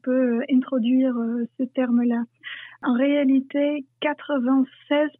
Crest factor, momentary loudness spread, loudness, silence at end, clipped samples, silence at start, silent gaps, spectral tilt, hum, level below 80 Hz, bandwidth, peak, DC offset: 14 dB; 7 LU; -23 LUFS; 0.1 s; under 0.1%; 0.05 s; none; -9 dB/octave; none; -84 dBFS; 3.8 kHz; -10 dBFS; under 0.1%